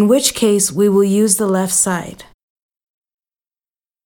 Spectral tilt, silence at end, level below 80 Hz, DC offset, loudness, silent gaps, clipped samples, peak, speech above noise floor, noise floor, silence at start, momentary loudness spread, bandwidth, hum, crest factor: -4 dB/octave; 1.85 s; -54 dBFS; under 0.1%; -14 LUFS; none; under 0.1%; 0 dBFS; over 76 dB; under -90 dBFS; 0 s; 4 LU; 19 kHz; none; 16 dB